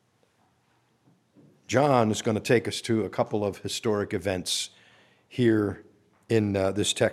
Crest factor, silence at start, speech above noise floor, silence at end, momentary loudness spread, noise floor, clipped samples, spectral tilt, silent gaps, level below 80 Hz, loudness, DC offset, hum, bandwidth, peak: 20 dB; 1.7 s; 42 dB; 0 s; 7 LU; -67 dBFS; under 0.1%; -5 dB/octave; none; -64 dBFS; -26 LUFS; under 0.1%; none; 15 kHz; -6 dBFS